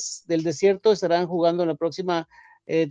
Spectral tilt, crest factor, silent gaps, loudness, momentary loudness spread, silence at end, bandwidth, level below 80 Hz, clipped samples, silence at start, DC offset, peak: -5 dB/octave; 14 dB; none; -23 LUFS; 7 LU; 0 s; 9.4 kHz; -70 dBFS; under 0.1%; 0 s; under 0.1%; -8 dBFS